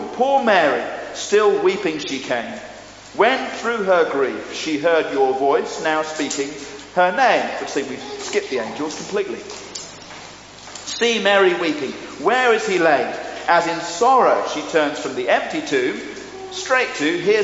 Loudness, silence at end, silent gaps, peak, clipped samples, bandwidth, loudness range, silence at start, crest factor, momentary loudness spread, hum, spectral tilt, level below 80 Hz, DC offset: -19 LUFS; 0 s; none; -2 dBFS; under 0.1%; 8 kHz; 4 LU; 0 s; 18 dB; 16 LU; none; -1.5 dB/octave; -58 dBFS; under 0.1%